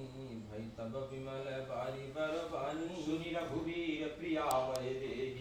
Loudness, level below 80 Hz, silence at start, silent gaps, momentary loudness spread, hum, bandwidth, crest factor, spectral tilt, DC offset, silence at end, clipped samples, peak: -40 LUFS; -62 dBFS; 0 s; none; 10 LU; none; 19 kHz; 20 dB; -5.5 dB/octave; under 0.1%; 0 s; under 0.1%; -20 dBFS